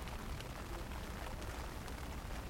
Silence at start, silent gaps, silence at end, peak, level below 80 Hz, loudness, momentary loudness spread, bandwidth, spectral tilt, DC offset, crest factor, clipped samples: 0 s; none; 0 s; -28 dBFS; -48 dBFS; -46 LUFS; 1 LU; 17 kHz; -4.5 dB/octave; under 0.1%; 18 dB; under 0.1%